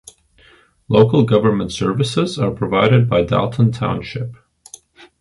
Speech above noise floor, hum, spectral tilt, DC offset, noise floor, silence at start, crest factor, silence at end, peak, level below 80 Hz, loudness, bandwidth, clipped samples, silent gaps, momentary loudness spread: 35 dB; none; -7 dB/octave; under 0.1%; -51 dBFS; 0.9 s; 16 dB; 0.85 s; 0 dBFS; -44 dBFS; -16 LUFS; 11.5 kHz; under 0.1%; none; 10 LU